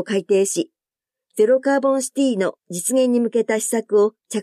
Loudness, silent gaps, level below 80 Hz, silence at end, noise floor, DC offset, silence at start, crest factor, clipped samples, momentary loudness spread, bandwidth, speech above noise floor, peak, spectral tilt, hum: -19 LUFS; none; -78 dBFS; 0 s; -88 dBFS; under 0.1%; 0 s; 14 dB; under 0.1%; 7 LU; 15 kHz; 69 dB; -6 dBFS; -4 dB/octave; none